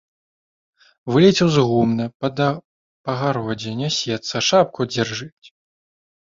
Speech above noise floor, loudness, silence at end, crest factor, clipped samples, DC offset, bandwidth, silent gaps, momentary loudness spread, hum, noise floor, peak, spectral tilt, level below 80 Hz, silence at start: over 71 dB; -19 LUFS; 1 s; 18 dB; under 0.1%; under 0.1%; 7.6 kHz; 2.14-2.20 s, 2.65-3.04 s; 15 LU; none; under -90 dBFS; -2 dBFS; -5 dB/octave; -56 dBFS; 1.05 s